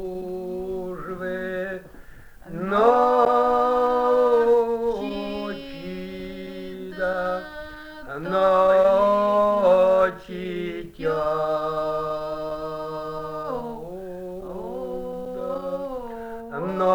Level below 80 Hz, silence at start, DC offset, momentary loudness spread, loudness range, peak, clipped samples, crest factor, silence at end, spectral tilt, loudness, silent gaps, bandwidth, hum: -48 dBFS; 0 s; under 0.1%; 17 LU; 11 LU; -6 dBFS; under 0.1%; 18 dB; 0 s; -6.5 dB/octave; -23 LUFS; none; over 20 kHz; none